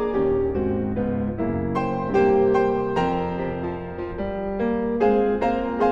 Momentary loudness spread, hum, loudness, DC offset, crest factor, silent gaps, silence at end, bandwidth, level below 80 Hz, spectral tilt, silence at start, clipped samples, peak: 9 LU; none; -23 LUFS; under 0.1%; 14 dB; none; 0 s; 7.4 kHz; -40 dBFS; -8.5 dB/octave; 0 s; under 0.1%; -8 dBFS